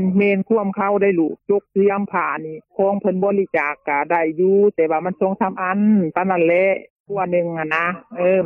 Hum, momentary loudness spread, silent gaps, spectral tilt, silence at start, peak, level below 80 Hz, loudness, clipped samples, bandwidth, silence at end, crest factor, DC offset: none; 6 LU; 6.90-7.04 s; -10 dB/octave; 0 s; -4 dBFS; -64 dBFS; -19 LUFS; under 0.1%; 3.5 kHz; 0 s; 14 dB; under 0.1%